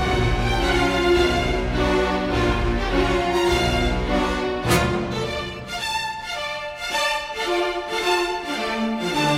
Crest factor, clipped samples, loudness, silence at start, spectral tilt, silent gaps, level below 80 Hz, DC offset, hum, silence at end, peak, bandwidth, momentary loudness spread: 16 dB; under 0.1%; -22 LUFS; 0 s; -5 dB/octave; none; -30 dBFS; under 0.1%; none; 0 s; -6 dBFS; 16.5 kHz; 8 LU